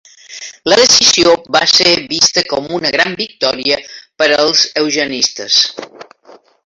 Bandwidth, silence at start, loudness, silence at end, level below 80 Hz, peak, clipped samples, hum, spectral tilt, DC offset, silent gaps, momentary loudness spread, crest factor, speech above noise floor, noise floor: 16 kHz; 0.3 s; -11 LUFS; 0.6 s; -52 dBFS; 0 dBFS; under 0.1%; none; -1 dB/octave; under 0.1%; none; 10 LU; 14 dB; 31 dB; -43 dBFS